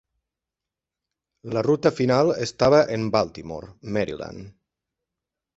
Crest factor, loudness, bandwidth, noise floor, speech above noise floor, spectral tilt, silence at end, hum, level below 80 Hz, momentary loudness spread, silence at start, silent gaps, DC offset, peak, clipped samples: 20 dB; -22 LUFS; 8 kHz; -88 dBFS; 65 dB; -6 dB/octave; 1.1 s; none; -54 dBFS; 18 LU; 1.45 s; none; under 0.1%; -4 dBFS; under 0.1%